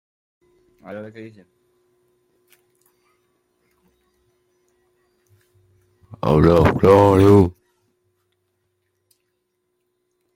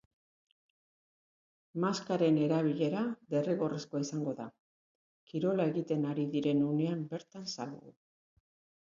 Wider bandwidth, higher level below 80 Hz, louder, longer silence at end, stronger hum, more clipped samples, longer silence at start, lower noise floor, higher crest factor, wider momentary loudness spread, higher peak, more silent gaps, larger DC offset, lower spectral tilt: first, 16.5 kHz vs 7.6 kHz; first, -44 dBFS vs -78 dBFS; first, -14 LUFS vs -33 LUFS; first, 2.85 s vs 0.9 s; neither; neither; second, 0.9 s vs 1.75 s; second, -73 dBFS vs under -90 dBFS; about the same, 20 dB vs 18 dB; first, 25 LU vs 13 LU; first, -2 dBFS vs -18 dBFS; second, none vs 4.60-5.27 s; neither; first, -8.5 dB/octave vs -7 dB/octave